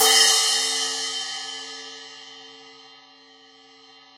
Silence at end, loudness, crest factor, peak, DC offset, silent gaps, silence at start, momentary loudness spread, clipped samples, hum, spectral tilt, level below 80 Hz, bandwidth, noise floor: 1.45 s; -20 LUFS; 22 dB; -4 dBFS; under 0.1%; none; 0 s; 26 LU; under 0.1%; none; 3 dB/octave; -78 dBFS; 16.5 kHz; -51 dBFS